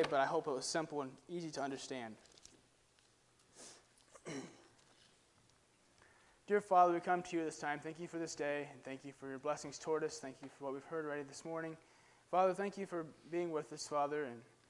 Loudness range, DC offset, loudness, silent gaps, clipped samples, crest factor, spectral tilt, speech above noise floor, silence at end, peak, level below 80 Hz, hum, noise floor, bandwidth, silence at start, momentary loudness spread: 19 LU; under 0.1%; -40 LUFS; none; under 0.1%; 24 dB; -4.5 dB/octave; 32 dB; 0.25 s; -18 dBFS; -82 dBFS; none; -72 dBFS; 11.5 kHz; 0 s; 16 LU